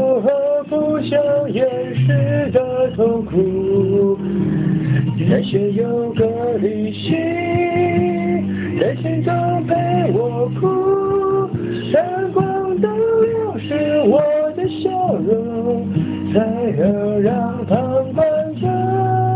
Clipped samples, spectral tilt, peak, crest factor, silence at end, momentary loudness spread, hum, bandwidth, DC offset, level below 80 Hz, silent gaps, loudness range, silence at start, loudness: under 0.1%; -12 dB/octave; -2 dBFS; 14 dB; 0 s; 4 LU; none; 4 kHz; under 0.1%; -46 dBFS; none; 1 LU; 0 s; -18 LUFS